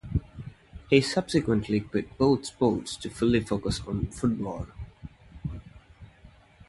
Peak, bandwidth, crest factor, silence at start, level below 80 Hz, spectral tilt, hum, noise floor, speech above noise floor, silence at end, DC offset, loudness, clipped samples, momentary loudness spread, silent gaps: -6 dBFS; 11.5 kHz; 22 dB; 0.05 s; -44 dBFS; -6 dB/octave; none; -54 dBFS; 28 dB; 0.4 s; under 0.1%; -27 LUFS; under 0.1%; 21 LU; none